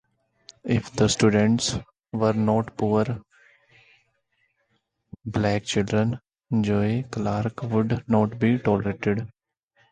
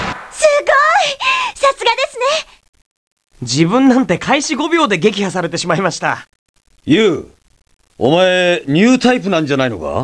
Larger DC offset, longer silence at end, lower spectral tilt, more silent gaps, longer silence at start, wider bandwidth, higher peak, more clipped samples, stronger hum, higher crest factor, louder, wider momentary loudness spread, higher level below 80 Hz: neither; first, 0.65 s vs 0 s; first, -6 dB/octave vs -4.5 dB/octave; second, none vs 2.69-2.73 s, 2.86-3.17 s, 6.39-6.54 s; first, 0.65 s vs 0 s; about the same, 10 kHz vs 11 kHz; second, -6 dBFS vs 0 dBFS; neither; neither; about the same, 18 dB vs 14 dB; second, -24 LUFS vs -14 LUFS; about the same, 10 LU vs 9 LU; about the same, -50 dBFS vs -48 dBFS